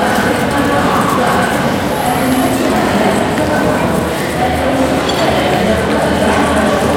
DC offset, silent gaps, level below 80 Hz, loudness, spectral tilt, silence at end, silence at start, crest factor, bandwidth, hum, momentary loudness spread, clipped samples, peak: under 0.1%; none; -34 dBFS; -13 LUFS; -5 dB/octave; 0 s; 0 s; 12 dB; 17 kHz; none; 3 LU; under 0.1%; 0 dBFS